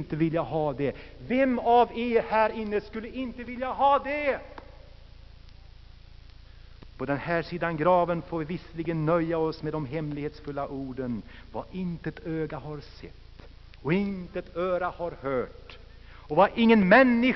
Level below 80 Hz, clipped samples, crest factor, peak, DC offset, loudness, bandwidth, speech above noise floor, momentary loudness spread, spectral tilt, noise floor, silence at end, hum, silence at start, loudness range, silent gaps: -50 dBFS; under 0.1%; 20 dB; -6 dBFS; under 0.1%; -27 LUFS; 6 kHz; 22 dB; 16 LU; -5 dB/octave; -48 dBFS; 0 s; none; 0 s; 9 LU; none